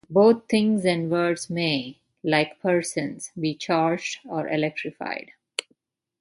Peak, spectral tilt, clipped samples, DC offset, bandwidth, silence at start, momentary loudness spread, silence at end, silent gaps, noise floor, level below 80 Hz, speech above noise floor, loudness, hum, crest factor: -4 dBFS; -5 dB/octave; under 0.1%; under 0.1%; 11.5 kHz; 0.1 s; 13 LU; 0.6 s; none; -68 dBFS; -68 dBFS; 45 dB; -24 LUFS; none; 20 dB